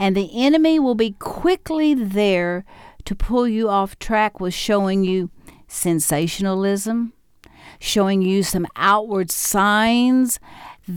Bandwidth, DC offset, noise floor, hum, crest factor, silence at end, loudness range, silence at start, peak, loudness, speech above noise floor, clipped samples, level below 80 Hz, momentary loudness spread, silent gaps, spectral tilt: 19 kHz; under 0.1%; -48 dBFS; none; 16 dB; 0 s; 3 LU; 0 s; -4 dBFS; -19 LUFS; 29 dB; under 0.1%; -38 dBFS; 9 LU; none; -4.5 dB/octave